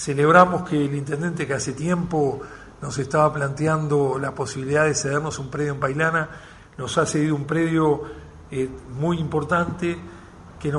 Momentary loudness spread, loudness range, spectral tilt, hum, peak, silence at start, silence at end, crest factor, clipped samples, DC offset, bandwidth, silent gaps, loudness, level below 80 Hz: 13 LU; 2 LU; -5.5 dB/octave; none; 0 dBFS; 0 s; 0 s; 22 dB; under 0.1%; under 0.1%; 11.5 kHz; none; -22 LUFS; -50 dBFS